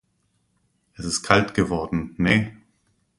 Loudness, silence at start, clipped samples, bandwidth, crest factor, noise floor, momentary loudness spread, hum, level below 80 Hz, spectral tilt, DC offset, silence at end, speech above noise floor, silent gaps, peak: -22 LUFS; 1 s; under 0.1%; 11.5 kHz; 24 dB; -69 dBFS; 11 LU; none; -46 dBFS; -4.5 dB/octave; under 0.1%; 0.65 s; 47 dB; none; 0 dBFS